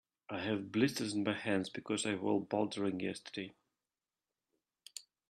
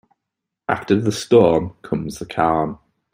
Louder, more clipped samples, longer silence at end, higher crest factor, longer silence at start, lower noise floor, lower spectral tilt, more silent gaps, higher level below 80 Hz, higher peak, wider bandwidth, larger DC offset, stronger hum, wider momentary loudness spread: second, -37 LUFS vs -19 LUFS; neither; about the same, 0.3 s vs 0.4 s; about the same, 22 dB vs 20 dB; second, 0.3 s vs 0.7 s; first, under -90 dBFS vs -82 dBFS; second, -4.5 dB/octave vs -6 dB/octave; neither; second, -80 dBFS vs -50 dBFS; second, -18 dBFS vs 0 dBFS; second, 13 kHz vs 16 kHz; neither; neither; about the same, 13 LU vs 13 LU